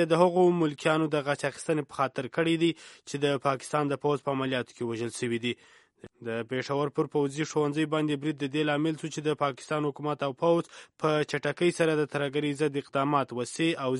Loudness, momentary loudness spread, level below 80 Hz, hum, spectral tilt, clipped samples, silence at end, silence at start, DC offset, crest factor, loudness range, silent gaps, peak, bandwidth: -29 LUFS; 7 LU; -72 dBFS; none; -5.5 dB/octave; under 0.1%; 0 s; 0 s; under 0.1%; 22 dB; 4 LU; none; -8 dBFS; 11.5 kHz